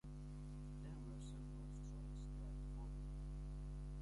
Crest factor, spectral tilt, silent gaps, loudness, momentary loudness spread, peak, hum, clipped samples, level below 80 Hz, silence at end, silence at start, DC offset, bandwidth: 8 dB; -7.5 dB/octave; none; -52 LUFS; 2 LU; -42 dBFS; 50 Hz at -50 dBFS; under 0.1%; -52 dBFS; 0 s; 0.05 s; under 0.1%; 11.5 kHz